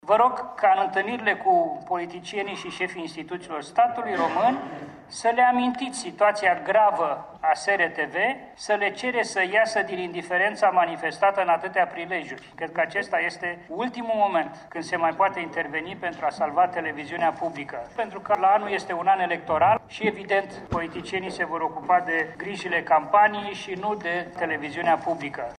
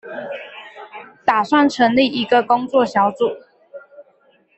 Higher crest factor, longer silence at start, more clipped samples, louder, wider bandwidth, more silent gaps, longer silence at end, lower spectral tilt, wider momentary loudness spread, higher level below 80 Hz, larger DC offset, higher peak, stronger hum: about the same, 18 dB vs 16 dB; about the same, 0.05 s vs 0.05 s; neither; second, -24 LUFS vs -17 LUFS; first, 11 kHz vs 8.2 kHz; neither; second, 0.05 s vs 0.55 s; about the same, -4 dB/octave vs -5 dB/octave; second, 11 LU vs 21 LU; about the same, -62 dBFS vs -60 dBFS; neither; second, -6 dBFS vs -2 dBFS; neither